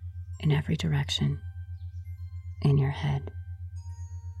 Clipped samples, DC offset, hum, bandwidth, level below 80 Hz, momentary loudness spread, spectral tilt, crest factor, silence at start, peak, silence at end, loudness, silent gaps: under 0.1%; under 0.1%; none; 9.4 kHz; -50 dBFS; 15 LU; -6.5 dB/octave; 16 dB; 0 s; -14 dBFS; 0 s; -29 LUFS; none